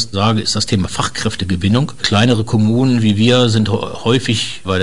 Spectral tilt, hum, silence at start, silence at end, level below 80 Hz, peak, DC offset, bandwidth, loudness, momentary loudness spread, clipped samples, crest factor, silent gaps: -5 dB/octave; none; 0 s; 0 s; -44 dBFS; 0 dBFS; 3%; 11 kHz; -15 LUFS; 7 LU; under 0.1%; 14 dB; none